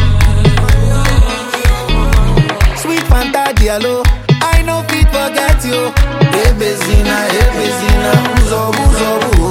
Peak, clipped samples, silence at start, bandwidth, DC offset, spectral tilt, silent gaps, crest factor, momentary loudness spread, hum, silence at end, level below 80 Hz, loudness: 0 dBFS; under 0.1%; 0 s; 16.5 kHz; under 0.1%; -5 dB/octave; none; 10 dB; 3 LU; none; 0 s; -12 dBFS; -12 LUFS